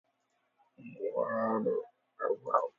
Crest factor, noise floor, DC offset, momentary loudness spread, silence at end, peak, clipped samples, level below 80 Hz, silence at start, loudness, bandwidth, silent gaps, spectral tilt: 22 dB; -78 dBFS; under 0.1%; 21 LU; 0.1 s; -12 dBFS; under 0.1%; -84 dBFS; 0.8 s; -34 LUFS; 7.2 kHz; none; -7.5 dB/octave